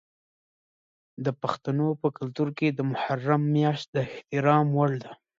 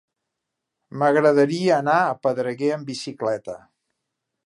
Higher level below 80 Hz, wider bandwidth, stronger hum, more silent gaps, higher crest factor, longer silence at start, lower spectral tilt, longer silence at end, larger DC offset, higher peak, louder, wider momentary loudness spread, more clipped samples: about the same, -70 dBFS vs -72 dBFS; second, 7.4 kHz vs 11.5 kHz; neither; first, 3.88-3.93 s vs none; about the same, 20 dB vs 18 dB; first, 1.2 s vs 0.95 s; first, -8 dB/octave vs -6 dB/octave; second, 0.25 s vs 0.9 s; neither; second, -8 dBFS vs -4 dBFS; second, -27 LUFS vs -21 LUFS; second, 9 LU vs 15 LU; neither